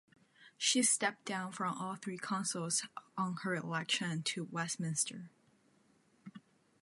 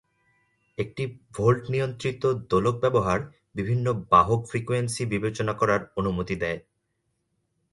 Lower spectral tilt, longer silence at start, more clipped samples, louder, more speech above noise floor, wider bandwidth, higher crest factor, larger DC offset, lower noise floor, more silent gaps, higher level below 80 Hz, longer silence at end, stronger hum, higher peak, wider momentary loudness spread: second, -2.5 dB/octave vs -6.5 dB/octave; second, 0.4 s vs 0.8 s; neither; second, -36 LUFS vs -25 LUFS; second, 34 dB vs 51 dB; about the same, 12 kHz vs 11.5 kHz; about the same, 20 dB vs 20 dB; neither; second, -71 dBFS vs -76 dBFS; neither; second, -86 dBFS vs -50 dBFS; second, 0.45 s vs 1.15 s; neither; second, -18 dBFS vs -6 dBFS; about the same, 12 LU vs 13 LU